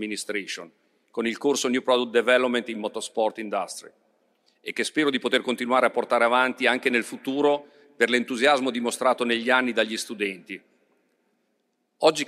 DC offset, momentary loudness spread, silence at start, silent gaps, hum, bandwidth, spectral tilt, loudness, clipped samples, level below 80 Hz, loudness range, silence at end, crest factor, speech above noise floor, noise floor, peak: under 0.1%; 11 LU; 0 s; none; none; 15 kHz; -2.5 dB/octave; -24 LUFS; under 0.1%; -78 dBFS; 4 LU; 0 s; 20 dB; 49 dB; -73 dBFS; -4 dBFS